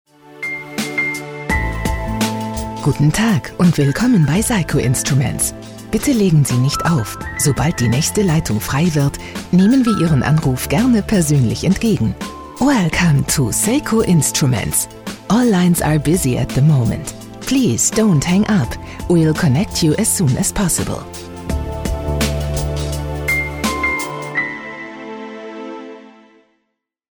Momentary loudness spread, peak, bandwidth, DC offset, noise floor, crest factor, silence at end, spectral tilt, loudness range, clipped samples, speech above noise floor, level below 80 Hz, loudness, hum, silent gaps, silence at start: 12 LU; -4 dBFS; over 20 kHz; under 0.1%; -72 dBFS; 12 dB; 1.1 s; -5 dB/octave; 5 LU; under 0.1%; 58 dB; -32 dBFS; -16 LUFS; none; none; 0.3 s